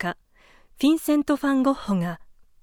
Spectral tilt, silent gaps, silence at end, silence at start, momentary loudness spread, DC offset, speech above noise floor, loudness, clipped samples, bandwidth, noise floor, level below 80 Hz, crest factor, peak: -6 dB/octave; none; 0.4 s; 0 s; 12 LU; under 0.1%; 34 dB; -23 LUFS; under 0.1%; 18 kHz; -55 dBFS; -54 dBFS; 14 dB; -10 dBFS